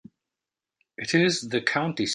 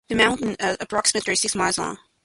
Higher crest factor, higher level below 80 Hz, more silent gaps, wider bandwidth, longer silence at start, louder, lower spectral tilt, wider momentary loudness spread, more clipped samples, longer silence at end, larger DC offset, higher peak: about the same, 20 dB vs 20 dB; second, -66 dBFS vs -52 dBFS; neither; about the same, 11.5 kHz vs 11.5 kHz; first, 1 s vs 0.1 s; about the same, -24 LUFS vs -22 LUFS; first, -4 dB/octave vs -2 dB/octave; about the same, 4 LU vs 6 LU; neither; second, 0 s vs 0.3 s; neither; about the same, -6 dBFS vs -4 dBFS